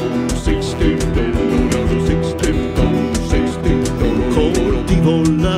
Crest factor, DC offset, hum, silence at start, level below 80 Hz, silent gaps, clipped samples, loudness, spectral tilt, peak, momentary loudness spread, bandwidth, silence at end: 14 dB; under 0.1%; none; 0 s; -22 dBFS; none; under 0.1%; -16 LUFS; -6.5 dB/octave; -2 dBFS; 4 LU; 14.5 kHz; 0 s